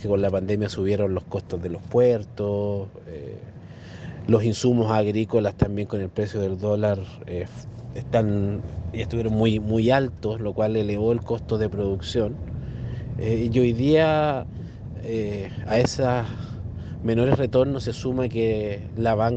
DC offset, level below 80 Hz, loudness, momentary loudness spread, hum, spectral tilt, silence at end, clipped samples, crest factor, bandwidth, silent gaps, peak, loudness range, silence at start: under 0.1%; -44 dBFS; -24 LUFS; 14 LU; none; -7.5 dB/octave; 0 s; under 0.1%; 18 dB; 8.4 kHz; none; -4 dBFS; 3 LU; 0 s